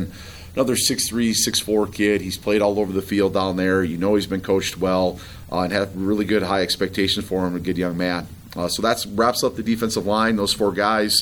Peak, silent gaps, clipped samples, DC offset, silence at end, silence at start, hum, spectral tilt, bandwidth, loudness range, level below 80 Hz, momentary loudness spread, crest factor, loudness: -4 dBFS; none; under 0.1%; 0.1%; 0 s; 0 s; none; -4 dB/octave; over 20 kHz; 2 LU; -48 dBFS; 6 LU; 18 dB; -21 LUFS